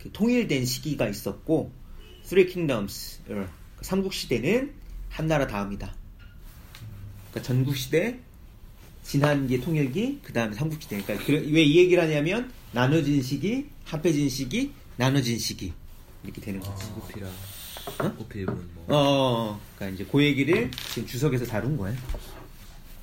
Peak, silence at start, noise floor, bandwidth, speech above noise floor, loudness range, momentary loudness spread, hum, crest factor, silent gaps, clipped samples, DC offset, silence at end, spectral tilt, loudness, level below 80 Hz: -8 dBFS; 0 s; -46 dBFS; 16.5 kHz; 21 dB; 8 LU; 17 LU; none; 20 dB; none; under 0.1%; under 0.1%; 0 s; -5.5 dB/octave; -26 LUFS; -44 dBFS